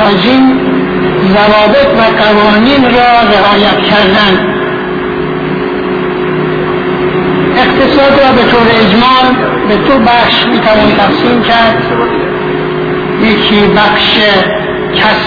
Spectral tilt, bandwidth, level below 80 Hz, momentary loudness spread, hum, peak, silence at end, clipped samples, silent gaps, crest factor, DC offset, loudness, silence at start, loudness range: -7 dB/octave; 5.4 kHz; -32 dBFS; 8 LU; none; 0 dBFS; 0 s; 0.7%; none; 8 dB; under 0.1%; -7 LUFS; 0 s; 4 LU